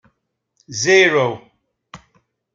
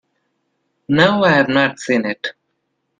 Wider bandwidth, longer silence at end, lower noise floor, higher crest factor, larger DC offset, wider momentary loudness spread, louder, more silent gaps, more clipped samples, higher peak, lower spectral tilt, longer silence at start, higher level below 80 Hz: second, 7.6 kHz vs 9.6 kHz; about the same, 0.6 s vs 0.7 s; about the same, -72 dBFS vs -71 dBFS; about the same, 18 dB vs 18 dB; neither; first, 18 LU vs 12 LU; about the same, -15 LUFS vs -15 LUFS; neither; neither; about the same, -2 dBFS vs 0 dBFS; second, -3.5 dB/octave vs -5.5 dB/octave; second, 0.7 s vs 0.9 s; second, -64 dBFS vs -56 dBFS